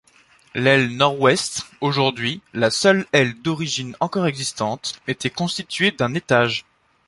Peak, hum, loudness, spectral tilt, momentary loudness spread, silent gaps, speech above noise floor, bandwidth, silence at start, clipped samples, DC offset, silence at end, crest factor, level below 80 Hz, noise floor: -2 dBFS; none; -20 LUFS; -4 dB/octave; 9 LU; none; 34 dB; 11.5 kHz; 0.55 s; under 0.1%; under 0.1%; 0.45 s; 20 dB; -58 dBFS; -55 dBFS